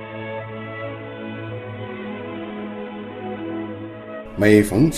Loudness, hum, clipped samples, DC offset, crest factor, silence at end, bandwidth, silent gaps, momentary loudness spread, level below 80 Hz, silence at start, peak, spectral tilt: -24 LUFS; none; under 0.1%; under 0.1%; 22 dB; 0 s; 14.5 kHz; none; 17 LU; -46 dBFS; 0 s; -2 dBFS; -6.5 dB/octave